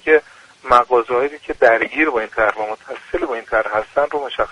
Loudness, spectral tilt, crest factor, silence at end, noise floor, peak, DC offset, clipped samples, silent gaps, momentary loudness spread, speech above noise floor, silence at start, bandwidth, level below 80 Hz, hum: -18 LUFS; -4.5 dB/octave; 18 dB; 0 s; -38 dBFS; 0 dBFS; under 0.1%; under 0.1%; none; 12 LU; 20 dB; 0.05 s; 11 kHz; -46 dBFS; none